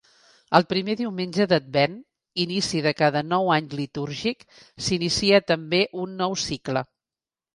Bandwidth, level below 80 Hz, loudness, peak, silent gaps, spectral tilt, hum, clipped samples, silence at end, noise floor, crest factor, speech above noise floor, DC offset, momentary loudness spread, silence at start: 11.5 kHz; -56 dBFS; -23 LUFS; 0 dBFS; none; -4.5 dB/octave; none; under 0.1%; 0.7 s; under -90 dBFS; 24 dB; over 67 dB; under 0.1%; 10 LU; 0.5 s